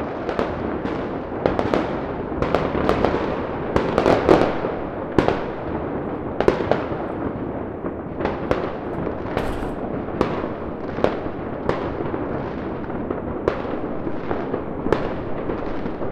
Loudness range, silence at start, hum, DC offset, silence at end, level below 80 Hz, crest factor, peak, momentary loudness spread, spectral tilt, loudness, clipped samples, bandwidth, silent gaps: 6 LU; 0 s; none; under 0.1%; 0 s; -38 dBFS; 22 dB; 0 dBFS; 8 LU; -7.5 dB/octave; -24 LUFS; under 0.1%; 13 kHz; none